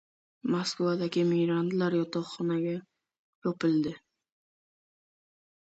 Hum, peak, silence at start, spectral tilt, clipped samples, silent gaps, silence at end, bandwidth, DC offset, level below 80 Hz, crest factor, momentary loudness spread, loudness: none; -16 dBFS; 0.45 s; -6.5 dB/octave; under 0.1%; 3.19-3.42 s; 1.7 s; 8.2 kHz; under 0.1%; -72 dBFS; 14 dB; 9 LU; -30 LUFS